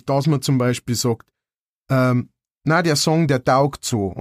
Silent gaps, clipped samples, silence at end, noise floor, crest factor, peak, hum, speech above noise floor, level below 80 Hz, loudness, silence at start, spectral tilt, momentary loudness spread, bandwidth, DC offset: 1.59-1.83 s, 2.51-2.55 s; under 0.1%; 0 s; under -90 dBFS; 16 dB; -4 dBFS; none; over 72 dB; -52 dBFS; -19 LUFS; 0.05 s; -5.5 dB/octave; 7 LU; 15.5 kHz; under 0.1%